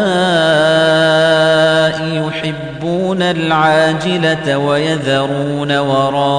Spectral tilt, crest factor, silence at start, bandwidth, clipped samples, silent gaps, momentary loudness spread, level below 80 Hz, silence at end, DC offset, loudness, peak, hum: -5.5 dB/octave; 12 dB; 0 s; 10 kHz; under 0.1%; none; 7 LU; -48 dBFS; 0 s; under 0.1%; -13 LUFS; -2 dBFS; none